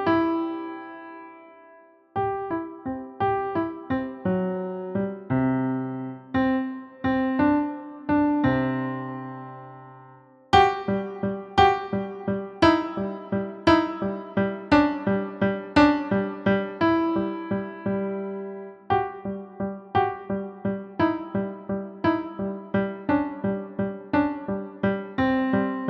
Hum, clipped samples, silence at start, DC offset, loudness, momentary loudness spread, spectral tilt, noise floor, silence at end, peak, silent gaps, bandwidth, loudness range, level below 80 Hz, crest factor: none; under 0.1%; 0 s; under 0.1%; -25 LUFS; 14 LU; -7.5 dB/octave; -53 dBFS; 0 s; -4 dBFS; none; 8.4 kHz; 6 LU; -50 dBFS; 20 dB